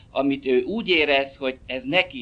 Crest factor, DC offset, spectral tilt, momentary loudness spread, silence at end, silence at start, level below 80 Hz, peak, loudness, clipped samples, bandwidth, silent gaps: 18 dB; under 0.1%; -6 dB/octave; 10 LU; 0 s; 0.15 s; -52 dBFS; -4 dBFS; -22 LUFS; under 0.1%; 7.8 kHz; none